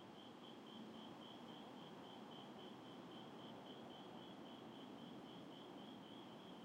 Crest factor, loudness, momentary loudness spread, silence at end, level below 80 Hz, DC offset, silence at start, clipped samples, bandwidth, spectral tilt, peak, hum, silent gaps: 12 dB; -57 LUFS; 1 LU; 0 s; under -90 dBFS; under 0.1%; 0 s; under 0.1%; 16 kHz; -5.5 dB/octave; -44 dBFS; none; none